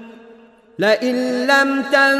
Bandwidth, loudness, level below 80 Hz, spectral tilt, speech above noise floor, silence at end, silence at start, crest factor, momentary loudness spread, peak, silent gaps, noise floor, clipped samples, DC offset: 13 kHz; -16 LUFS; -70 dBFS; -3.5 dB/octave; 30 dB; 0 s; 0 s; 16 dB; 5 LU; -2 dBFS; none; -46 dBFS; under 0.1%; under 0.1%